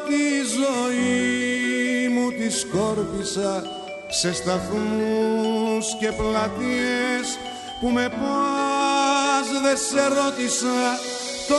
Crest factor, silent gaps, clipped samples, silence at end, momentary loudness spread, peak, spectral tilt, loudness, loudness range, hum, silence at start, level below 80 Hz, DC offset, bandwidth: 16 dB; none; under 0.1%; 0 s; 6 LU; -8 dBFS; -3 dB/octave; -22 LUFS; 3 LU; none; 0 s; -50 dBFS; under 0.1%; 11.5 kHz